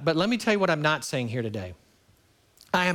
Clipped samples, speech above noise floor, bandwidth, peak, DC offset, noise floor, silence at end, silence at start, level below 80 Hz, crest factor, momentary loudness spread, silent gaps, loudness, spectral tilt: under 0.1%; 36 dB; 17.5 kHz; -8 dBFS; under 0.1%; -62 dBFS; 0 s; 0 s; -62 dBFS; 20 dB; 11 LU; none; -26 LUFS; -5 dB/octave